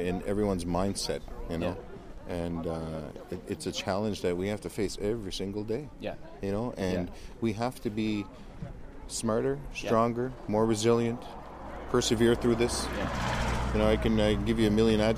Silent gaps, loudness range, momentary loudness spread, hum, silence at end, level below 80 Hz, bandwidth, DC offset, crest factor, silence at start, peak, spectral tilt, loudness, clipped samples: none; 6 LU; 15 LU; none; 0 s; -42 dBFS; 15 kHz; under 0.1%; 18 dB; 0 s; -12 dBFS; -5.5 dB/octave; -30 LUFS; under 0.1%